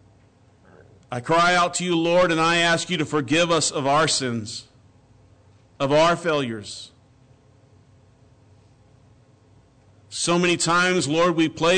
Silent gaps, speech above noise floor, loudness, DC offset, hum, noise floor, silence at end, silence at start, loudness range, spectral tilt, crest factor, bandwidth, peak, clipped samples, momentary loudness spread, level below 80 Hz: none; 35 dB; -20 LUFS; under 0.1%; none; -55 dBFS; 0 s; 1.1 s; 9 LU; -3.5 dB/octave; 12 dB; 9.4 kHz; -12 dBFS; under 0.1%; 15 LU; -56 dBFS